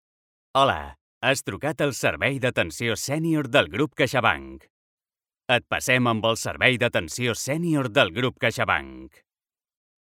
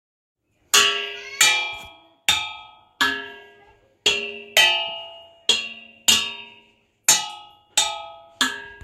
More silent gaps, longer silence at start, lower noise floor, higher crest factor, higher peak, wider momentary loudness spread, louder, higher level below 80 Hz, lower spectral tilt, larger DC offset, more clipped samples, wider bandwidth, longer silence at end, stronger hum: first, 1.01-1.21 s, 4.70-4.97 s vs none; second, 0.55 s vs 0.75 s; first, under -90 dBFS vs -58 dBFS; about the same, 22 dB vs 24 dB; about the same, -2 dBFS vs 0 dBFS; second, 6 LU vs 18 LU; second, -23 LUFS vs -20 LUFS; first, -54 dBFS vs -62 dBFS; first, -4 dB/octave vs 1.5 dB/octave; neither; neither; about the same, 17 kHz vs 16 kHz; first, 1 s vs 0.1 s; neither